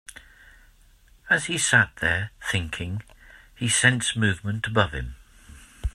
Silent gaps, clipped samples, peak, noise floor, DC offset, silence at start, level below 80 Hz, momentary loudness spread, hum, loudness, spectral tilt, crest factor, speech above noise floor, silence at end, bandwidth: none; under 0.1%; -2 dBFS; -55 dBFS; under 0.1%; 0.15 s; -44 dBFS; 16 LU; none; -23 LUFS; -3 dB/octave; 24 dB; 31 dB; 0.05 s; 14 kHz